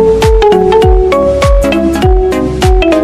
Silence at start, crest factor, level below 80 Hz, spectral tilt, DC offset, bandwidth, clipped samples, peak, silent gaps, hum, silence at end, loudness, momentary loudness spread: 0 s; 8 dB; -12 dBFS; -6.5 dB/octave; 0.7%; 14 kHz; 1%; 0 dBFS; none; none; 0 s; -9 LUFS; 4 LU